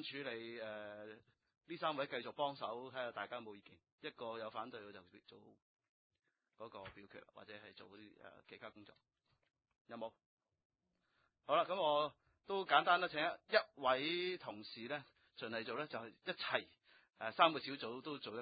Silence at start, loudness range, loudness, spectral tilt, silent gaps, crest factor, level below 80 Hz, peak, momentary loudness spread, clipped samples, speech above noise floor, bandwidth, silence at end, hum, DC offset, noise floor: 0 s; 21 LU; -41 LUFS; -1 dB/octave; 1.57-1.61 s, 3.92-3.98 s, 5.62-5.77 s, 5.89-6.10 s, 9.81-9.85 s, 10.26-10.37 s, 10.65-10.70 s; 28 dB; -84 dBFS; -16 dBFS; 23 LU; under 0.1%; 42 dB; 4.9 kHz; 0 s; none; under 0.1%; -84 dBFS